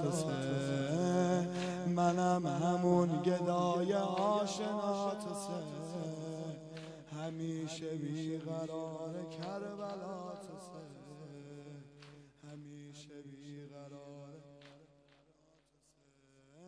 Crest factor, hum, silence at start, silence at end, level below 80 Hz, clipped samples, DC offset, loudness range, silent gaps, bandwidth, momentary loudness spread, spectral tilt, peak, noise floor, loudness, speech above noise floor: 20 dB; none; 0 s; 0 s; -72 dBFS; under 0.1%; under 0.1%; 20 LU; none; 11 kHz; 20 LU; -6.5 dB/octave; -18 dBFS; -72 dBFS; -36 LUFS; 36 dB